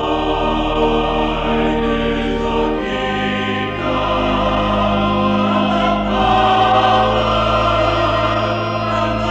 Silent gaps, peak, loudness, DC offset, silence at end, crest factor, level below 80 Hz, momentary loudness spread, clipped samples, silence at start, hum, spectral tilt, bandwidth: none; -4 dBFS; -16 LUFS; under 0.1%; 0 s; 12 dB; -28 dBFS; 6 LU; under 0.1%; 0 s; none; -6.5 dB/octave; 8.4 kHz